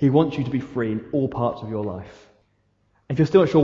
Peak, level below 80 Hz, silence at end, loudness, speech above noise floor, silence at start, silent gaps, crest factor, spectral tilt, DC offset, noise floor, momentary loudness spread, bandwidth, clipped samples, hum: -4 dBFS; -54 dBFS; 0 s; -23 LUFS; 45 dB; 0 s; none; 18 dB; -9 dB/octave; under 0.1%; -66 dBFS; 13 LU; 7.4 kHz; under 0.1%; none